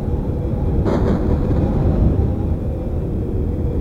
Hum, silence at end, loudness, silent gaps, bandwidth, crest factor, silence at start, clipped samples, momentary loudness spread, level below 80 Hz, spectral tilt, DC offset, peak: none; 0 s; -20 LUFS; none; 6.4 kHz; 12 dB; 0 s; under 0.1%; 6 LU; -22 dBFS; -10.5 dB/octave; under 0.1%; -4 dBFS